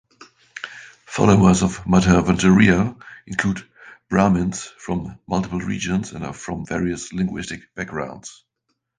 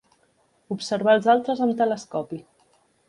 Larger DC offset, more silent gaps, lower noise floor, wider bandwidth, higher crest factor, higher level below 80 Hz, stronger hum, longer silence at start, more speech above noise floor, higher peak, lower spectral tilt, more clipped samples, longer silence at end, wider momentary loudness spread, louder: neither; neither; first, -74 dBFS vs -65 dBFS; second, 9.8 kHz vs 11 kHz; about the same, 20 dB vs 18 dB; first, -40 dBFS vs -70 dBFS; neither; second, 0.2 s vs 0.7 s; first, 55 dB vs 43 dB; first, 0 dBFS vs -6 dBFS; about the same, -6 dB/octave vs -5.5 dB/octave; neither; about the same, 0.65 s vs 0.7 s; first, 20 LU vs 16 LU; about the same, -20 LUFS vs -22 LUFS